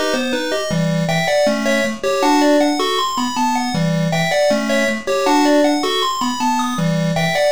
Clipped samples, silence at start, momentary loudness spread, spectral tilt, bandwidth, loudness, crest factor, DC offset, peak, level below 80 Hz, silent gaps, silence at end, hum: under 0.1%; 0 s; 5 LU; -4.5 dB/octave; over 20 kHz; -17 LUFS; 12 dB; 2%; -4 dBFS; -50 dBFS; none; 0 s; none